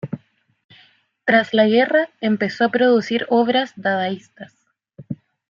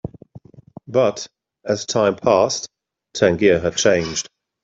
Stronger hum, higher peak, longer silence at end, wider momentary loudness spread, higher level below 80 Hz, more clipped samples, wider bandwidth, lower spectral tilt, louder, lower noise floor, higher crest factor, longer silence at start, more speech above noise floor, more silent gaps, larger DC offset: neither; about the same, -2 dBFS vs -2 dBFS; about the same, 0.35 s vs 0.4 s; about the same, 18 LU vs 19 LU; second, -68 dBFS vs -54 dBFS; neither; about the same, 7.4 kHz vs 7.8 kHz; first, -6 dB/octave vs -4 dB/octave; about the same, -18 LUFS vs -18 LUFS; first, -55 dBFS vs -44 dBFS; about the same, 18 dB vs 18 dB; about the same, 0.05 s vs 0.05 s; first, 37 dB vs 27 dB; first, 0.64-0.69 s vs none; neither